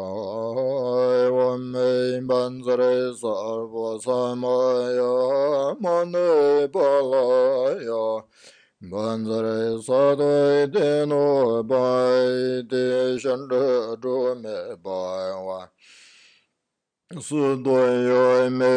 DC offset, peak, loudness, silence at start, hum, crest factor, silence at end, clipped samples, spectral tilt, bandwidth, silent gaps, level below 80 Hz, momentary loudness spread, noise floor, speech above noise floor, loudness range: under 0.1%; -8 dBFS; -22 LUFS; 0 s; none; 14 dB; 0 s; under 0.1%; -6 dB/octave; 10 kHz; none; -74 dBFS; 10 LU; -82 dBFS; 61 dB; 6 LU